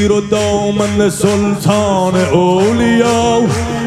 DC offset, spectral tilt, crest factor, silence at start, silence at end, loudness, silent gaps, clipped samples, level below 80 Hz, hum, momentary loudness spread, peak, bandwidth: under 0.1%; -5.5 dB/octave; 12 dB; 0 s; 0 s; -12 LUFS; none; under 0.1%; -36 dBFS; none; 3 LU; 0 dBFS; 14.5 kHz